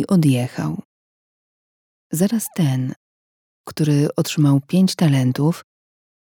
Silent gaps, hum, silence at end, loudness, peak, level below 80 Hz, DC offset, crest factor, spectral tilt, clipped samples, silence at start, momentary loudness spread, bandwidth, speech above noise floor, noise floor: 0.85-2.10 s, 2.96-3.64 s; none; 0.7 s; -19 LUFS; -4 dBFS; -64 dBFS; under 0.1%; 16 dB; -6.5 dB/octave; under 0.1%; 0 s; 12 LU; 19 kHz; over 72 dB; under -90 dBFS